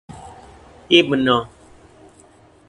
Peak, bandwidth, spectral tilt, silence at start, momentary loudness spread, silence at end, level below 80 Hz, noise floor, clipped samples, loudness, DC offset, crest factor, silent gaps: 0 dBFS; 11 kHz; -5 dB/octave; 0.1 s; 25 LU; 1.25 s; -52 dBFS; -50 dBFS; under 0.1%; -16 LUFS; under 0.1%; 22 dB; none